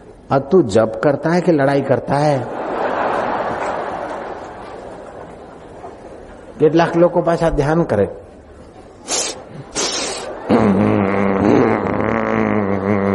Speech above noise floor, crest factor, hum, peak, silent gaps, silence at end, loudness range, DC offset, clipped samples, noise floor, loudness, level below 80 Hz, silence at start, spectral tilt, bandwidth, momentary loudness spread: 25 dB; 16 dB; none; -2 dBFS; none; 0 s; 7 LU; under 0.1%; under 0.1%; -39 dBFS; -17 LUFS; -42 dBFS; 0 s; -5.5 dB/octave; 11.5 kHz; 21 LU